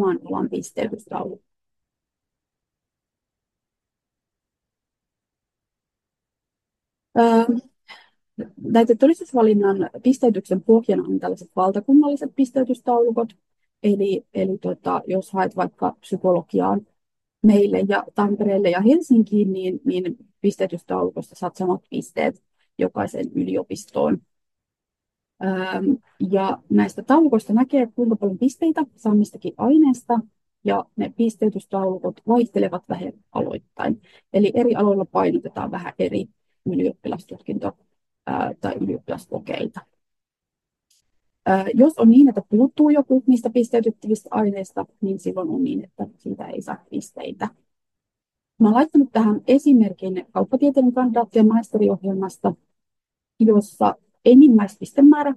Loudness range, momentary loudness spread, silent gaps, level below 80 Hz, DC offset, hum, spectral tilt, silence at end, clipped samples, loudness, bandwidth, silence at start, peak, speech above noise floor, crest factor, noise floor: 10 LU; 14 LU; none; -66 dBFS; under 0.1%; none; -7.5 dB/octave; 0 s; under 0.1%; -20 LUFS; 12 kHz; 0 s; -2 dBFS; 67 dB; 18 dB; -86 dBFS